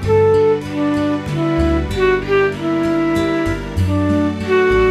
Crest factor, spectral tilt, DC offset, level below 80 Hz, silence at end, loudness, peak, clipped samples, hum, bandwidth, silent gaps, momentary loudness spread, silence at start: 12 dB; -7 dB/octave; under 0.1%; -30 dBFS; 0 s; -16 LUFS; -4 dBFS; under 0.1%; none; 13.5 kHz; none; 6 LU; 0 s